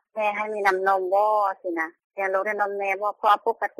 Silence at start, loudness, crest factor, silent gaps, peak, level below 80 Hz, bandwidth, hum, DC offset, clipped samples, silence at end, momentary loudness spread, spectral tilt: 0.15 s; -24 LUFS; 16 dB; 2.04-2.10 s; -8 dBFS; -74 dBFS; 15 kHz; none; under 0.1%; under 0.1%; 0.1 s; 8 LU; -4 dB/octave